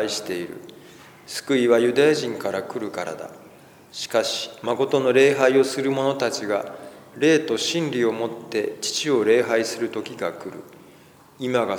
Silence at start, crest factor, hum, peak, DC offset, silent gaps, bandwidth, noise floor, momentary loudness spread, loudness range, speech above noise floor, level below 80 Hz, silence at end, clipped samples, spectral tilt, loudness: 0 s; 18 dB; none; -4 dBFS; under 0.1%; none; 19.5 kHz; -50 dBFS; 18 LU; 4 LU; 28 dB; -72 dBFS; 0 s; under 0.1%; -4 dB/octave; -22 LUFS